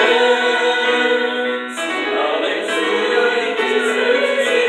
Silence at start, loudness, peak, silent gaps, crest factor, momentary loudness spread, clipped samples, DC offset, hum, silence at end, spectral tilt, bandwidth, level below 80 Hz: 0 s; -16 LUFS; -2 dBFS; none; 14 dB; 6 LU; under 0.1%; under 0.1%; none; 0 s; -1.5 dB/octave; 12.5 kHz; -72 dBFS